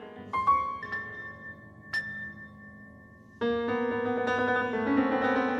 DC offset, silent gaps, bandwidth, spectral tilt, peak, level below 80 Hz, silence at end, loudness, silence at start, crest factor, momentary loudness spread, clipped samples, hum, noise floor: under 0.1%; none; 11 kHz; -6.5 dB/octave; -14 dBFS; -60 dBFS; 0 s; -29 LUFS; 0 s; 16 dB; 20 LU; under 0.1%; none; -52 dBFS